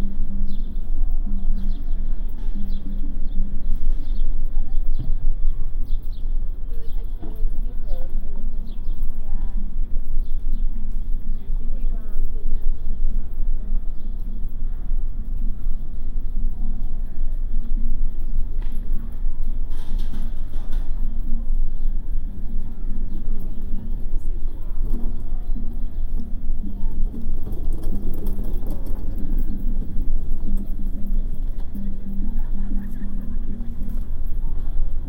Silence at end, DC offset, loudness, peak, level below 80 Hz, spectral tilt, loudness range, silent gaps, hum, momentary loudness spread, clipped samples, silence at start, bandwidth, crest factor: 0 s; under 0.1%; -31 LUFS; -6 dBFS; -20 dBFS; -9 dB/octave; 2 LU; none; none; 4 LU; under 0.1%; 0 s; 1 kHz; 10 dB